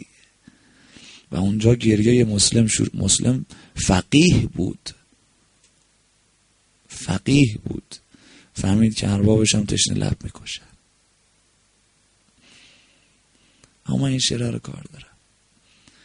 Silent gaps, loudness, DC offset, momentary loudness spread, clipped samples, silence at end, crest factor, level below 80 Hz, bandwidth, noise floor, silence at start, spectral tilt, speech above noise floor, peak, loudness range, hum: none; -19 LUFS; under 0.1%; 19 LU; under 0.1%; 1 s; 20 dB; -42 dBFS; 10.5 kHz; -62 dBFS; 0 s; -4.5 dB/octave; 42 dB; -2 dBFS; 9 LU; none